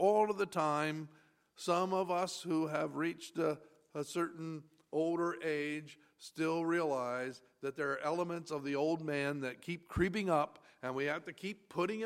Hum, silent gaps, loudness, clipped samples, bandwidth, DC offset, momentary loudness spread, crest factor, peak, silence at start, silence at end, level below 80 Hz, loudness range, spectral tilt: none; none; -37 LUFS; under 0.1%; 15.5 kHz; under 0.1%; 11 LU; 18 dB; -18 dBFS; 0 s; 0 s; -62 dBFS; 2 LU; -5.5 dB/octave